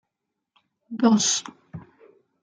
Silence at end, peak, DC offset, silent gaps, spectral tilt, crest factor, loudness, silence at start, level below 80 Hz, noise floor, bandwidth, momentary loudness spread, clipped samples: 0.6 s; -4 dBFS; under 0.1%; none; -3 dB/octave; 22 dB; -21 LUFS; 0.9 s; -70 dBFS; -82 dBFS; 9.6 kHz; 25 LU; under 0.1%